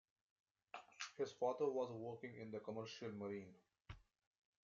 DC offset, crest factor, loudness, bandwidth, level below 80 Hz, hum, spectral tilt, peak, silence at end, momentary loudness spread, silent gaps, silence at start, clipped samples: under 0.1%; 20 dB; -47 LUFS; 7.4 kHz; -78 dBFS; none; -4.5 dB/octave; -28 dBFS; 0.65 s; 20 LU; none; 0.75 s; under 0.1%